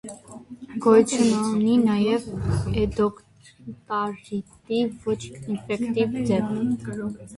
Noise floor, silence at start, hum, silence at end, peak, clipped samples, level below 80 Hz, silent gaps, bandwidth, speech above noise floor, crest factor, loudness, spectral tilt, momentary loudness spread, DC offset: -42 dBFS; 0.05 s; none; 0 s; -4 dBFS; under 0.1%; -46 dBFS; none; 11.5 kHz; 19 dB; 20 dB; -24 LUFS; -6 dB/octave; 18 LU; under 0.1%